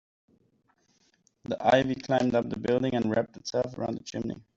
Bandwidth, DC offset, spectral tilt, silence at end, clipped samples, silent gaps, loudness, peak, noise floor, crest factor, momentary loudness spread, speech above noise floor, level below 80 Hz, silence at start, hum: 7.8 kHz; under 0.1%; -6 dB/octave; 0.15 s; under 0.1%; none; -28 LUFS; -8 dBFS; -69 dBFS; 22 dB; 11 LU; 41 dB; -62 dBFS; 1.5 s; none